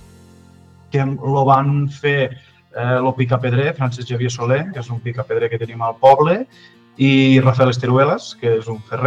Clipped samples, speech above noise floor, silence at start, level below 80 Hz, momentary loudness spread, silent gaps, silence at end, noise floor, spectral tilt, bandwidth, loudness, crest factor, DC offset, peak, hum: under 0.1%; 29 dB; 0.95 s; -58 dBFS; 12 LU; none; 0 s; -46 dBFS; -7 dB/octave; 7.6 kHz; -17 LUFS; 16 dB; under 0.1%; 0 dBFS; none